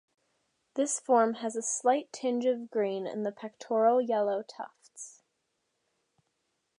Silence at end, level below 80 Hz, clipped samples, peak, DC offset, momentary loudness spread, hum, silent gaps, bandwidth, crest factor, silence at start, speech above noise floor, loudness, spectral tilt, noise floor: 1.65 s; -90 dBFS; under 0.1%; -12 dBFS; under 0.1%; 19 LU; none; none; 11.5 kHz; 20 dB; 0.75 s; 51 dB; -29 LUFS; -3.5 dB/octave; -80 dBFS